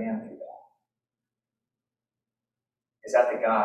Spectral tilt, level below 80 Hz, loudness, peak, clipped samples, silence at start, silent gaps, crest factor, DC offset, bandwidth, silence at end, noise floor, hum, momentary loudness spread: -5.5 dB/octave; -82 dBFS; -26 LUFS; -8 dBFS; under 0.1%; 0 s; none; 24 dB; under 0.1%; 10.5 kHz; 0 s; under -90 dBFS; none; 22 LU